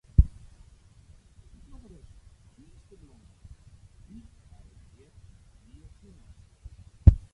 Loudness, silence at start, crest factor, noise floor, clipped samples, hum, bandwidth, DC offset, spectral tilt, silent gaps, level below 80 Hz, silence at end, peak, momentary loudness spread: -24 LUFS; 0.2 s; 28 dB; -55 dBFS; under 0.1%; none; 3 kHz; under 0.1%; -10 dB/octave; none; -32 dBFS; 0.15 s; -2 dBFS; 32 LU